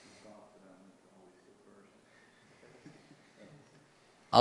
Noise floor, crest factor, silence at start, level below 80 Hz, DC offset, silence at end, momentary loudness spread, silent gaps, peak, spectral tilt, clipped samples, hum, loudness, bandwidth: -64 dBFS; 32 dB; 4.3 s; -78 dBFS; under 0.1%; 0 s; 6 LU; none; -8 dBFS; -5 dB/octave; under 0.1%; none; -29 LUFS; 11.5 kHz